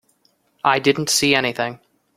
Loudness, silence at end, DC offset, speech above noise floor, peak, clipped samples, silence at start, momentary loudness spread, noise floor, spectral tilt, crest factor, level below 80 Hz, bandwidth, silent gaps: -18 LUFS; 0.4 s; under 0.1%; 44 dB; 0 dBFS; under 0.1%; 0.65 s; 10 LU; -63 dBFS; -3 dB/octave; 20 dB; -60 dBFS; 16.5 kHz; none